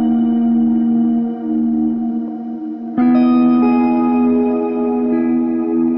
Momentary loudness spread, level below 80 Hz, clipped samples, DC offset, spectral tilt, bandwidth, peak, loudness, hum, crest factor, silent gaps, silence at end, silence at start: 10 LU; -54 dBFS; under 0.1%; 0.2%; -11 dB/octave; 5.2 kHz; -4 dBFS; -15 LUFS; none; 10 dB; none; 0 s; 0 s